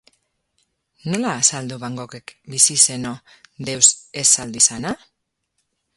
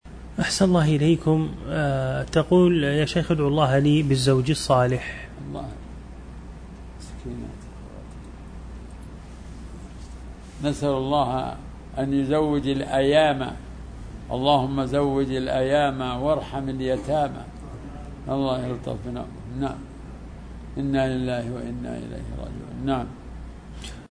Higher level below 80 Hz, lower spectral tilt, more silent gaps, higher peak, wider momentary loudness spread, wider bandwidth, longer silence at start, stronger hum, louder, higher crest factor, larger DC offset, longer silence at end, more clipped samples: second, -60 dBFS vs -40 dBFS; second, -1.5 dB/octave vs -6.5 dB/octave; neither; first, 0 dBFS vs -6 dBFS; about the same, 19 LU vs 21 LU; first, 16 kHz vs 11 kHz; first, 1.05 s vs 0.05 s; neither; first, -16 LUFS vs -23 LUFS; about the same, 22 dB vs 20 dB; neither; first, 1 s vs 0.05 s; neither